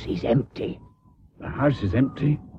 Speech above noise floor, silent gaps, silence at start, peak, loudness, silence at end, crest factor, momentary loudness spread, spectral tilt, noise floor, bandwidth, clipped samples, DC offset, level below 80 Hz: 31 dB; none; 0 s; -10 dBFS; -25 LUFS; 0 s; 16 dB; 14 LU; -9.5 dB/octave; -55 dBFS; 6.6 kHz; under 0.1%; under 0.1%; -44 dBFS